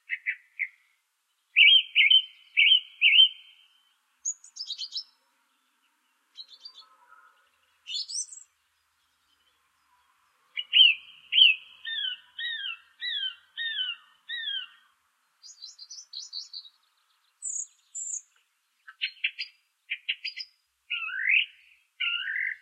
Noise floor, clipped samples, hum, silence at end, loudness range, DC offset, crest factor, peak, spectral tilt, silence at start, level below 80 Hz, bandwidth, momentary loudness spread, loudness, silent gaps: -75 dBFS; under 0.1%; none; 0.05 s; 20 LU; under 0.1%; 24 dB; -6 dBFS; 8 dB/octave; 0.1 s; under -90 dBFS; 9.4 kHz; 22 LU; -23 LUFS; none